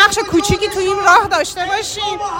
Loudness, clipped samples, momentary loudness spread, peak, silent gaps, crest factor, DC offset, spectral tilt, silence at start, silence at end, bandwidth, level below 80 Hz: -14 LUFS; 0.3%; 8 LU; 0 dBFS; none; 14 dB; under 0.1%; -3 dB/octave; 0 s; 0 s; 17 kHz; -36 dBFS